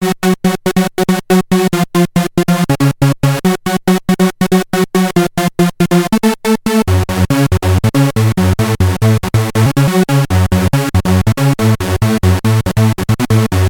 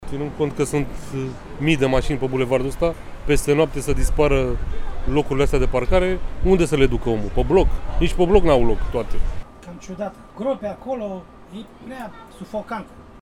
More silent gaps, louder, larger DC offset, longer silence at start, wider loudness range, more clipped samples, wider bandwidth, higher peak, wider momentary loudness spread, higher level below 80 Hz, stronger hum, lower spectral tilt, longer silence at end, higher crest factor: neither; first, -13 LUFS vs -22 LUFS; neither; about the same, 0 s vs 0 s; second, 1 LU vs 11 LU; neither; first, 19.5 kHz vs 13.5 kHz; about the same, 0 dBFS vs -2 dBFS; second, 2 LU vs 17 LU; second, -32 dBFS vs -26 dBFS; neither; about the same, -6 dB/octave vs -6 dB/octave; about the same, 0 s vs 0.05 s; second, 12 dB vs 18 dB